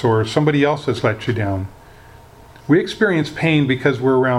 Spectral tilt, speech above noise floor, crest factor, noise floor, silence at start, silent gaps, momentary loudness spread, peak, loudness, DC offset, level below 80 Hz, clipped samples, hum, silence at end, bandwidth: -7 dB/octave; 26 dB; 16 dB; -43 dBFS; 0 s; none; 7 LU; -2 dBFS; -18 LUFS; under 0.1%; -50 dBFS; under 0.1%; none; 0 s; 12 kHz